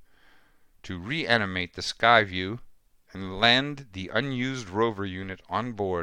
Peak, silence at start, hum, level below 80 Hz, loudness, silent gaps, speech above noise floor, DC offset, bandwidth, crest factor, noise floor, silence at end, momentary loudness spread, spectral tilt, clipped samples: -4 dBFS; 0.85 s; none; -56 dBFS; -25 LUFS; none; 32 dB; under 0.1%; 11.5 kHz; 24 dB; -58 dBFS; 0 s; 17 LU; -4.5 dB/octave; under 0.1%